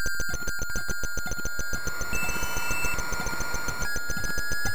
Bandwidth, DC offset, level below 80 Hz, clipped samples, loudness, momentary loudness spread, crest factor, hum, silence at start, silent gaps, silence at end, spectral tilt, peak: 19.5 kHz; 5%; -38 dBFS; under 0.1%; -30 LUFS; 3 LU; 16 dB; none; 0 s; none; 0 s; -2.5 dB/octave; -12 dBFS